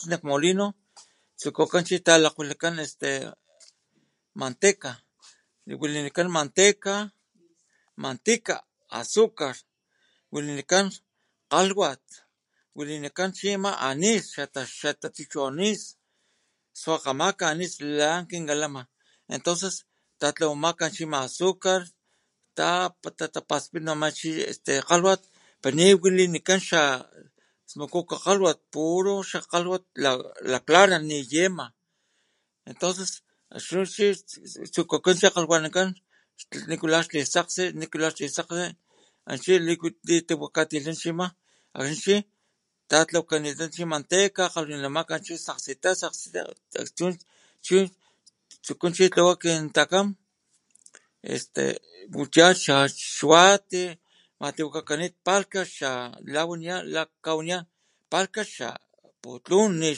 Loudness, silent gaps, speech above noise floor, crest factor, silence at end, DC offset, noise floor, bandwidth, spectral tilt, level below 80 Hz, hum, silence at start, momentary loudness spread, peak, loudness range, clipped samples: -24 LUFS; none; 51 dB; 26 dB; 0 s; under 0.1%; -76 dBFS; 11.5 kHz; -3 dB/octave; -76 dBFS; none; 0 s; 15 LU; 0 dBFS; 7 LU; under 0.1%